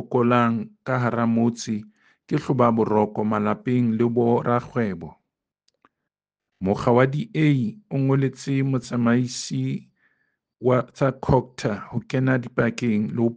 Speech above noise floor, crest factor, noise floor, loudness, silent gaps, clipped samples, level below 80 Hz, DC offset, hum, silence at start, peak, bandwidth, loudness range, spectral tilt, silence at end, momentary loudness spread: 63 dB; 20 dB; -85 dBFS; -23 LUFS; none; under 0.1%; -52 dBFS; under 0.1%; none; 0 s; -4 dBFS; 9.4 kHz; 3 LU; -7 dB/octave; 0 s; 9 LU